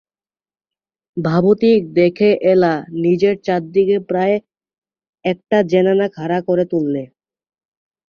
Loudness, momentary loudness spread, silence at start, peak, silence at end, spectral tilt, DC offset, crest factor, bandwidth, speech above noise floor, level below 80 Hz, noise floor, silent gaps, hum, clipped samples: -16 LUFS; 9 LU; 1.15 s; -2 dBFS; 1 s; -8.5 dB/octave; under 0.1%; 14 dB; 6.8 kHz; over 75 dB; -58 dBFS; under -90 dBFS; 4.78-4.82 s, 5.09-5.13 s; none; under 0.1%